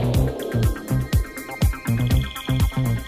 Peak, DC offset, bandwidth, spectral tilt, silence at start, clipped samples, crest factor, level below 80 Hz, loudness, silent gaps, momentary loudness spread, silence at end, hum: -10 dBFS; under 0.1%; 16 kHz; -6.5 dB/octave; 0 s; under 0.1%; 12 dB; -28 dBFS; -23 LUFS; none; 4 LU; 0 s; none